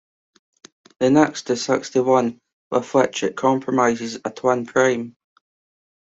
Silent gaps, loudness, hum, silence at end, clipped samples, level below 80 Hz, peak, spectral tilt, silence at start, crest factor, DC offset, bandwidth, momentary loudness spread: 2.53-2.71 s; -20 LUFS; none; 1.1 s; under 0.1%; -62 dBFS; -2 dBFS; -5 dB/octave; 1 s; 18 dB; under 0.1%; 8 kHz; 9 LU